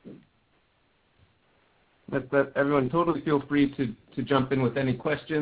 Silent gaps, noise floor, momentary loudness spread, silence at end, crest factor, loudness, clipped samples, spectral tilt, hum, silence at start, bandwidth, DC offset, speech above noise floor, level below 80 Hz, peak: none; -68 dBFS; 9 LU; 0 s; 20 dB; -27 LUFS; under 0.1%; -11 dB/octave; none; 0.05 s; 4 kHz; under 0.1%; 42 dB; -58 dBFS; -8 dBFS